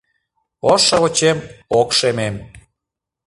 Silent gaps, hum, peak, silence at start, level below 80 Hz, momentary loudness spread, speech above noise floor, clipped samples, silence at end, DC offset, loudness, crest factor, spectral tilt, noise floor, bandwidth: none; none; 0 dBFS; 0.65 s; -50 dBFS; 12 LU; 67 dB; under 0.1%; 0.7 s; under 0.1%; -16 LUFS; 18 dB; -3 dB/octave; -83 dBFS; 11.5 kHz